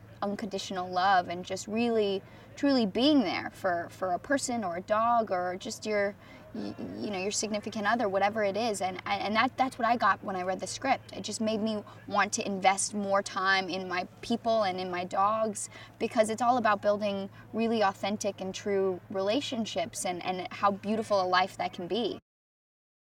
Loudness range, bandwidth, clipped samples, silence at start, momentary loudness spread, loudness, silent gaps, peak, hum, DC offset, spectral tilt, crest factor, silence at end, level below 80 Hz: 3 LU; 16.5 kHz; under 0.1%; 0 s; 10 LU; -30 LUFS; none; -10 dBFS; none; under 0.1%; -3.5 dB/octave; 20 dB; 0.95 s; -66 dBFS